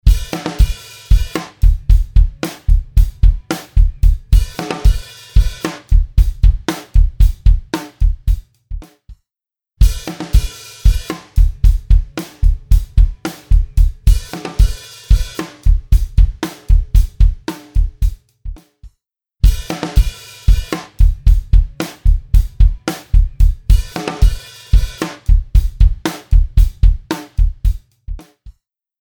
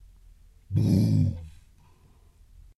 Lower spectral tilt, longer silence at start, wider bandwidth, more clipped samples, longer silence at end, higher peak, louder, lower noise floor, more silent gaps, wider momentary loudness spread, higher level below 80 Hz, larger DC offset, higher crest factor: second, -6 dB/octave vs -8.5 dB/octave; second, 0.05 s vs 0.7 s; first, 16.5 kHz vs 12 kHz; neither; second, 0.5 s vs 1.3 s; first, 0 dBFS vs -12 dBFS; first, -17 LUFS vs -25 LUFS; first, -89 dBFS vs -57 dBFS; neither; second, 10 LU vs 19 LU; first, -14 dBFS vs -50 dBFS; first, 0.2% vs under 0.1%; about the same, 12 dB vs 16 dB